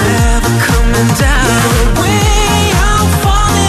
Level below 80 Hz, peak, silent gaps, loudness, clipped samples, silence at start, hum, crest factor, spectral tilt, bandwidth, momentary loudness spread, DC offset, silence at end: -14 dBFS; 0 dBFS; none; -10 LUFS; under 0.1%; 0 s; none; 8 dB; -4.5 dB/octave; 14 kHz; 1 LU; under 0.1%; 0 s